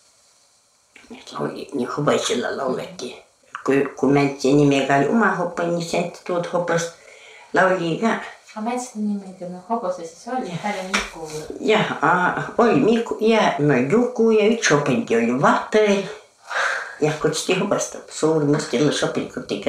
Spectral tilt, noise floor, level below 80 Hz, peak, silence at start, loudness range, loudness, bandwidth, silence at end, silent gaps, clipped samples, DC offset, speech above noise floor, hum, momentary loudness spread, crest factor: -5 dB/octave; -59 dBFS; -58 dBFS; -2 dBFS; 1.1 s; 8 LU; -20 LUFS; 13.5 kHz; 0 s; none; under 0.1%; under 0.1%; 39 dB; none; 12 LU; 18 dB